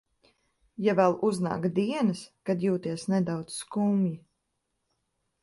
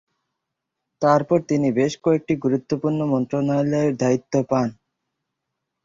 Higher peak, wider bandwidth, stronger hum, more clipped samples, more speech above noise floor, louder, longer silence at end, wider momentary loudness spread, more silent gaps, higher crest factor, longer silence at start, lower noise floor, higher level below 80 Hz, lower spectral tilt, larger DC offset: second, -10 dBFS vs -4 dBFS; first, 11.5 kHz vs 7.6 kHz; neither; neither; second, 52 dB vs 61 dB; second, -28 LUFS vs -21 LUFS; first, 1.25 s vs 1.1 s; first, 10 LU vs 4 LU; neither; about the same, 20 dB vs 18 dB; second, 0.8 s vs 1 s; about the same, -79 dBFS vs -81 dBFS; second, -68 dBFS vs -60 dBFS; about the same, -6.5 dB/octave vs -7.5 dB/octave; neither